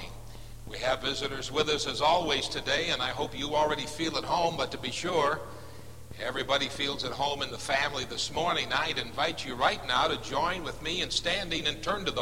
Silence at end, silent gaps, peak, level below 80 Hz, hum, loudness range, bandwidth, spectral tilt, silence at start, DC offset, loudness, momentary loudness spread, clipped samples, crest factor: 0 s; none; -12 dBFS; -50 dBFS; none; 2 LU; 16 kHz; -3 dB/octave; 0 s; 0.5%; -29 LUFS; 8 LU; under 0.1%; 20 dB